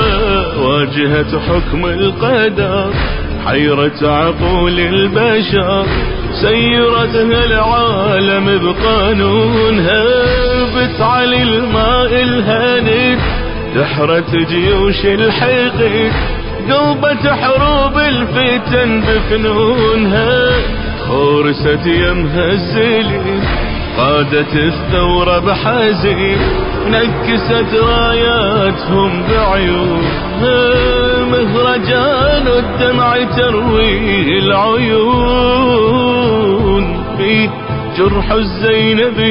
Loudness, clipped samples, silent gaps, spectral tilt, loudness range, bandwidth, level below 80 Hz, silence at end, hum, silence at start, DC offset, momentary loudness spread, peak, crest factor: -12 LUFS; under 0.1%; none; -10.5 dB/octave; 2 LU; 5.4 kHz; -22 dBFS; 0 s; none; 0 s; under 0.1%; 4 LU; 0 dBFS; 12 dB